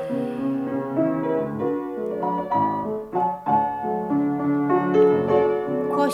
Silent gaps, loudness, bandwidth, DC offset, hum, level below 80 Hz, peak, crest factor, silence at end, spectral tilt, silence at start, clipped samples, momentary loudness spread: none; -23 LUFS; 7.8 kHz; under 0.1%; none; -60 dBFS; -8 dBFS; 16 dB; 0 s; -8 dB/octave; 0 s; under 0.1%; 8 LU